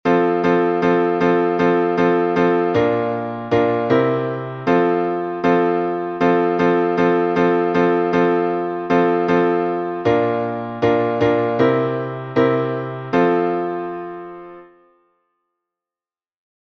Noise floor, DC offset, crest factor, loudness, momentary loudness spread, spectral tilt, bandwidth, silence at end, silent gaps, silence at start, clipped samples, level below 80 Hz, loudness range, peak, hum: under -90 dBFS; under 0.1%; 16 dB; -18 LUFS; 7 LU; -8 dB/octave; 6.2 kHz; 2.05 s; none; 0.05 s; under 0.1%; -56 dBFS; 5 LU; -2 dBFS; none